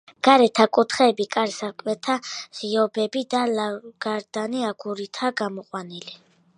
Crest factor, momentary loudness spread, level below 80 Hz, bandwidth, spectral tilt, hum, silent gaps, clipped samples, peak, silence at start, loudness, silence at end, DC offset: 22 dB; 15 LU; -74 dBFS; 10.5 kHz; -4 dB/octave; none; none; under 0.1%; 0 dBFS; 0.25 s; -23 LUFS; 0.4 s; under 0.1%